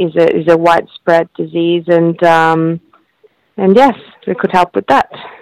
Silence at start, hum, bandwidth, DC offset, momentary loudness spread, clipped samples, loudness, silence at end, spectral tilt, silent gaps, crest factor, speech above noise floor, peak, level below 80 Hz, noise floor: 0 s; none; 12 kHz; under 0.1%; 11 LU; under 0.1%; -12 LUFS; 0.1 s; -7 dB/octave; none; 12 dB; 41 dB; 0 dBFS; -50 dBFS; -52 dBFS